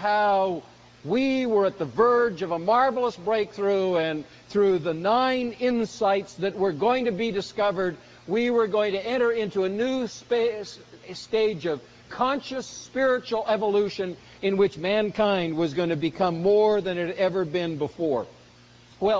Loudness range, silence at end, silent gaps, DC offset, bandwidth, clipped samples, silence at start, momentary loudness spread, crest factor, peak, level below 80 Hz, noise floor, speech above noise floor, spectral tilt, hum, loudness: 3 LU; 0 s; none; under 0.1%; 7.8 kHz; under 0.1%; 0 s; 9 LU; 16 dB; -8 dBFS; -60 dBFS; -52 dBFS; 28 dB; -5.5 dB/octave; none; -25 LUFS